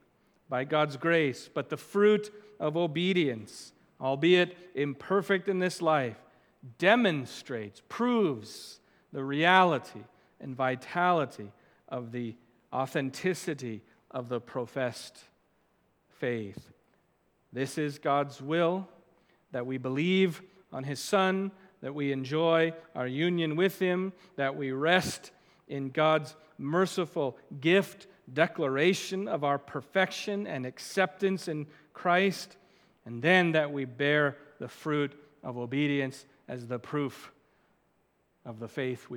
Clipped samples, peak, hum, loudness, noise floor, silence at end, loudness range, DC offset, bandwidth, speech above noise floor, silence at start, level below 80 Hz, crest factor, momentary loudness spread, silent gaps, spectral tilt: under 0.1%; -6 dBFS; none; -30 LUFS; -72 dBFS; 0 s; 7 LU; under 0.1%; 19 kHz; 42 dB; 0.5 s; -76 dBFS; 24 dB; 18 LU; none; -5.5 dB/octave